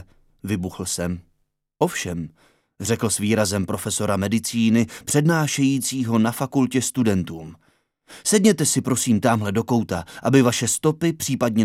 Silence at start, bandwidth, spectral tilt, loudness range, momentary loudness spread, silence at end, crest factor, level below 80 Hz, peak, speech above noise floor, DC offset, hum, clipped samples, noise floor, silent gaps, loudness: 0.45 s; 16 kHz; -4.5 dB/octave; 5 LU; 11 LU; 0 s; 18 dB; -54 dBFS; -4 dBFS; 48 dB; under 0.1%; none; under 0.1%; -69 dBFS; none; -21 LUFS